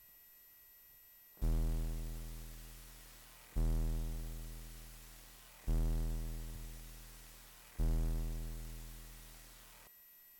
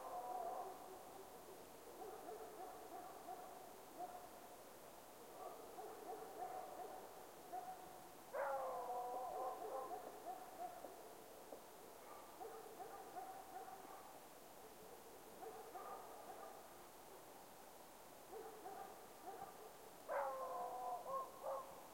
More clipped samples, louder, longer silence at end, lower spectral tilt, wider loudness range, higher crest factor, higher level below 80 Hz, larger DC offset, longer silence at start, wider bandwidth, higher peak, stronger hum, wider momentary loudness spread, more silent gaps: neither; first, -44 LUFS vs -53 LUFS; about the same, 0 s vs 0 s; first, -5.5 dB/octave vs -3 dB/octave; second, 3 LU vs 8 LU; second, 12 dB vs 20 dB; first, -42 dBFS vs -82 dBFS; neither; about the same, 0 s vs 0 s; first, 19 kHz vs 16.5 kHz; first, -28 dBFS vs -32 dBFS; neither; first, 20 LU vs 12 LU; neither